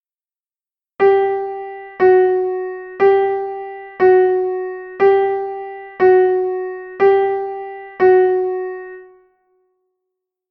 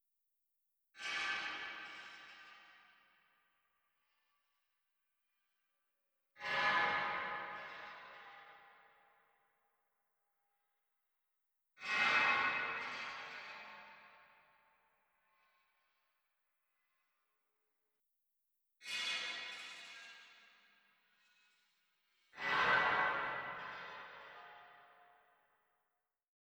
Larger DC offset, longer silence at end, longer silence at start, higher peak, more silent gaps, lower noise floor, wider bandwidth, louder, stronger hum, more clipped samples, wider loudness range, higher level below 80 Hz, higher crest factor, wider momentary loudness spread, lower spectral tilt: neither; second, 1.45 s vs 1.7 s; about the same, 1 s vs 0.95 s; first, -2 dBFS vs -22 dBFS; neither; about the same, under -90 dBFS vs -88 dBFS; second, 4.7 kHz vs over 20 kHz; first, -16 LUFS vs -37 LUFS; neither; neither; second, 2 LU vs 16 LU; first, -60 dBFS vs -80 dBFS; second, 14 dB vs 24 dB; second, 16 LU vs 24 LU; first, -8 dB/octave vs -1.5 dB/octave